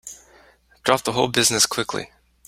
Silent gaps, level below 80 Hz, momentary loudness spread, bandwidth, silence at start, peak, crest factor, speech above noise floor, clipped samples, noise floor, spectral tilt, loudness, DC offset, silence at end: none; -56 dBFS; 18 LU; 16 kHz; 0.05 s; 0 dBFS; 24 dB; 34 dB; under 0.1%; -54 dBFS; -2 dB/octave; -20 LUFS; under 0.1%; 0.4 s